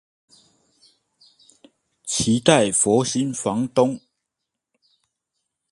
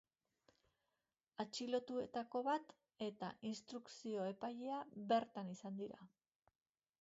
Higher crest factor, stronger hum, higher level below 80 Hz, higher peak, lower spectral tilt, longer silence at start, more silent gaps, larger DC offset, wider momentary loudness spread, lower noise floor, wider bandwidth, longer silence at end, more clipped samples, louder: about the same, 24 dB vs 20 dB; neither; first, -56 dBFS vs -88 dBFS; first, 0 dBFS vs -26 dBFS; about the same, -4 dB/octave vs -4 dB/octave; first, 2.05 s vs 1.4 s; neither; neither; about the same, 9 LU vs 11 LU; second, -82 dBFS vs under -90 dBFS; first, 11.5 kHz vs 7.6 kHz; first, 1.75 s vs 0.95 s; neither; first, -20 LUFS vs -45 LUFS